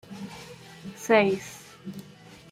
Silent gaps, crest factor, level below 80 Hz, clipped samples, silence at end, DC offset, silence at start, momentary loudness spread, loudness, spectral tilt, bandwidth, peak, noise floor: none; 22 dB; -66 dBFS; under 0.1%; 0.15 s; under 0.1%; 0.1 s; 23 LU; -24 LUFS; -5 dB/octave; 16 kHz; -8 dBFS; -49 dBFS